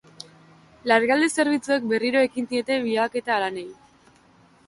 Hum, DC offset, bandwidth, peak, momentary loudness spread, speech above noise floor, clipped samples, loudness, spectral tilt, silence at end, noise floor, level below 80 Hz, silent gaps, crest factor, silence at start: none; under 0.1%; 11.5 kHz; -6 dBFS; 19 LU; 34 dB; under 0.1%; -22 LUFS; -3.5 dB/octave; 0.95 s; -56 dBFS; -68 dBFS; none; 20 dB; 0.85 s